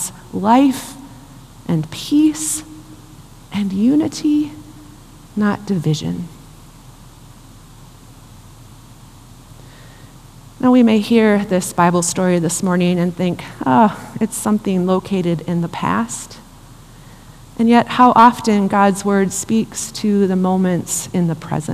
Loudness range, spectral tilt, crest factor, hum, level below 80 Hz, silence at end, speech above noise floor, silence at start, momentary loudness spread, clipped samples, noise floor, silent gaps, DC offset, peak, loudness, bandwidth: 10 LU; -5.5 dB/octave; 18 dB; none; -46 dBFS; 0 s; 25 dB; 0 s; 12 LU; under 0.1%; -41 dBFS; none; under 0.1%; 0 dBFS; -16 LUFS; 15 kHz